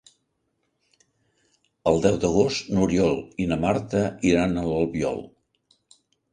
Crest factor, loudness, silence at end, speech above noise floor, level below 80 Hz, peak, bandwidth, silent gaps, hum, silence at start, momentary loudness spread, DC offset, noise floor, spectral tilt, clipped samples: 20 dB; -23 LUFS; 1.05 s; 52 dB; -46 dBFS; -4 dBFS; 10 kHz; none; none; 1.85 s; 7 LU; under 0.1%; -74 dBFS; -6 dB/octave; under 0.1%